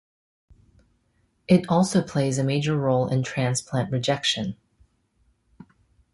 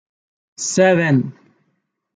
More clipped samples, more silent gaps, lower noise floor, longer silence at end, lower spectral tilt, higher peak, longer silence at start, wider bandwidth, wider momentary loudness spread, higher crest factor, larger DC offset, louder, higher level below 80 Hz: neither; neither; about the same, -68 dBFS vs -70 dBFS; first, 1.6 s vs 0.85 s; about the same, -5.5 dB/octave vs -5 dB/octave; second, -6 dBFS vs -2 dBFS; first, 1.5 s vs 0.6 s; first, 11.5 kHz vs 9.6 kHz; second, 7 LU vs 13 LU; about the same, 20 dB vs 18 dB; neither; second, -23 LUFS vs -16 LUFS; first, -58 dBFS vs -66 dBFS